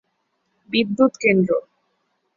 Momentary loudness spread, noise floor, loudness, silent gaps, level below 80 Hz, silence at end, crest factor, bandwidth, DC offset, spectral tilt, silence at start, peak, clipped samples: 7 LU; -71 dBFS; -19 LUFS; none; -62 dBFS; 0.75 s; 18 dB; 7.6 kHz; under 0.1%; -6 dB/octave; 0.7 s; -4 dBFS; under 0.1%